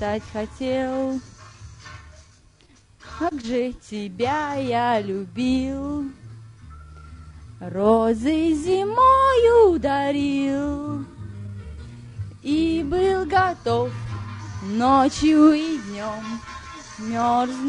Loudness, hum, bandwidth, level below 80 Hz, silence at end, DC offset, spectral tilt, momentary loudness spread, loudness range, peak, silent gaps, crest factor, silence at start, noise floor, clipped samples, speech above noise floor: -21 LUFS; none; 11 kHz; -44 dBFS; 0 s; under 0.1%; -6 dB/octave; 21 LU; 10 LU; -4 dBFS; none; 18 dB; 0 s; -54 dBFS; under 0.1%; 34 dB